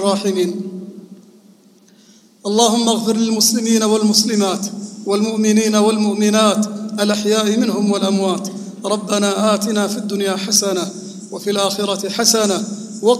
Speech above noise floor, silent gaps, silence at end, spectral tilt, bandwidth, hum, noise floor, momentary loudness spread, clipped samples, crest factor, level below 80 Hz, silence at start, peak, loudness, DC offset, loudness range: 33 dB; none; 0 s; -3.5 dB/octave; 15 kHz; none; -49 dBFS; 13 LU; under 0.1%; 16 dB; -68 dBFS; 0 s; 0 dBFS; -16 LUFS; under 0.1%; 3 LU